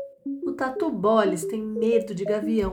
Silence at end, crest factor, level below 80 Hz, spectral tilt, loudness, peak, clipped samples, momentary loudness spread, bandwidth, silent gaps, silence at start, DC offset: 0 s; 18 dB; -52 dBFS; -6 dB/octave; -25 LUFS; -8 dBFS; under 0.1%; 9 LU; 18 kHz; none; 0 s; under 0.1%